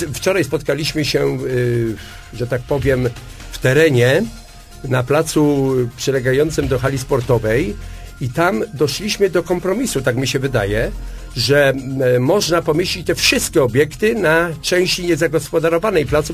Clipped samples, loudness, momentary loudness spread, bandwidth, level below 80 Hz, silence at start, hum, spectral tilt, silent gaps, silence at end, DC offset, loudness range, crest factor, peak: under 0.1%; -17 LUFS; 10 LU; 15.5 kHz; -34 dBFS; 0 s; none; -5 dB/octave; none; 0 s; under 0.1%; 3 LU; 16 dB; 0 dBFS